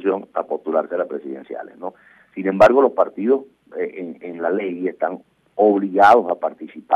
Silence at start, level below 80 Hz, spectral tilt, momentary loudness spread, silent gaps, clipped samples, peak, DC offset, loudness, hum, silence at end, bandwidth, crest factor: 0 s; -60 dBFS; -7 dB/octave; 21 LU; none; under 0.1%; -2 dBFS; under 0.1%; -19 LUFS; none; 0 s; 10 kHz; 16 dB